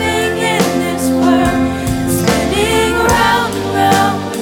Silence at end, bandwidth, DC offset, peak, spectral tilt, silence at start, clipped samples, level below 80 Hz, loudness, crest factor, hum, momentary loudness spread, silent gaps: 0 s; 19 kHz; under 0.1%; 0 dBFS; -4.5 dB/octave; 0 s; under 0.1%; -30 dBFS; -13 LUFS; 14 dB; none; 4 LU; none